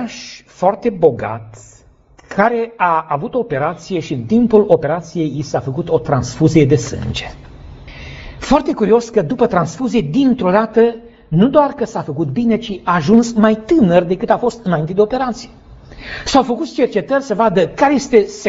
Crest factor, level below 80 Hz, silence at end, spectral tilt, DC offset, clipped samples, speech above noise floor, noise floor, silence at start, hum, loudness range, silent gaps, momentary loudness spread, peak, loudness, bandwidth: 16 dB; -40 dBFS; 0 s; -6 dB/octave; under 0.1%; under 0.1%; 32 dB; -47 dBFS; 0 s; none; 3 LU; none; 13 LU; 0 dBFS; -15 LUFS; 8 kHz